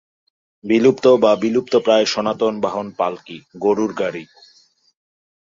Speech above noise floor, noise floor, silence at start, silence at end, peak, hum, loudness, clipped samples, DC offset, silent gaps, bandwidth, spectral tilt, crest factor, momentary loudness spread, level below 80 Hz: 38 dB; -55 dBFS; 0.65 s; 1.2 s; -2 dBFS; none; -17 LUFS; under 0.1%; under 0.1%; none; 7.6 kHz; -5 dB/octave; 16 dB; 13 LU; -62 dBFS